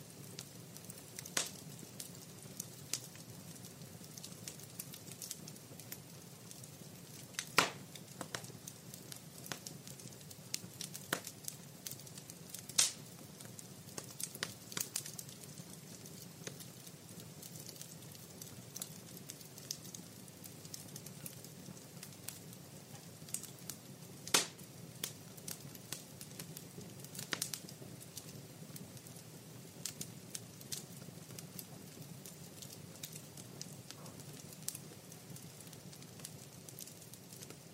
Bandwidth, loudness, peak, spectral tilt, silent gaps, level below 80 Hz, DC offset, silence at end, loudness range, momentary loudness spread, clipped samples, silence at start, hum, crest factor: 16 kHz; -45 LUFS; -10 dBFS; -2 dB/octave; none; -80 dBFS; under 0.1%; 0 s; 9 LU; 12 LU; under 0.1%; 0 s; none; 38 dB